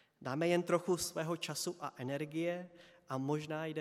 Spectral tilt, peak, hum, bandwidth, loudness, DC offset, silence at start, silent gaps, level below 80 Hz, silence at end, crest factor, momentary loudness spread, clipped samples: -5 dB/octave; -18 dBFS; none; 15.5 kHz; -38 LUFS; under 0.1%; 0.2 s; none; -76 dBFS; 0 s; 20 dB; 10 LU; under 0.1%